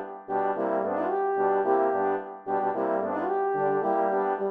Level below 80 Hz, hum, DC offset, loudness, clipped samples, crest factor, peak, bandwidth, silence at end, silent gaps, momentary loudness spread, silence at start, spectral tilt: -78 dBFS; none; under 0.1%; -27 LUFS; under 0.1%; 14 dB; -12 dBFS; 3.7 kHz; 0 s; none; 5 LU; 0 s; -9 dB/octave